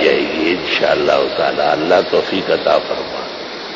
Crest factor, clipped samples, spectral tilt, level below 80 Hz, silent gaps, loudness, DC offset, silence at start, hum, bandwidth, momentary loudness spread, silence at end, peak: 14 dB; under 0.1%; -4.5 dB/octave; -50 dBFS; none; -15 LUFS; under 0.1%; 0 s; none; 7.6 kHz; 10 LU; 0 s; -2 dBFS